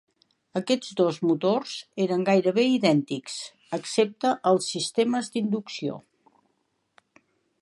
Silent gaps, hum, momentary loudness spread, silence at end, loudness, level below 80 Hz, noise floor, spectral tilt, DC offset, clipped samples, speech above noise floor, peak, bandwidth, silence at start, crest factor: none; none; 12 LU; 1.6 s; -25 LUFS; -78 dBFS; -74 dBFS; -5 dB/octave; under 0.1%; under 0.1%; 49 dB; -6 dBFS; 11.5 kHz; 0.55 s; 20 dB